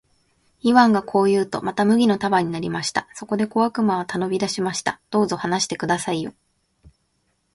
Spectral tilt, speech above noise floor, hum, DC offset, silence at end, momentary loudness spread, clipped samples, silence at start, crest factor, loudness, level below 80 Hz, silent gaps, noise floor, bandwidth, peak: -5 dB/octave; 48 dB; none; under 0.1%; 1.25 s; 8 LU; under 0.1%; 0.65 s; 20 dB; -21 LUFS; -60 dBFS; none; -69 dBFS; 11.5 kHz; -2 dBFS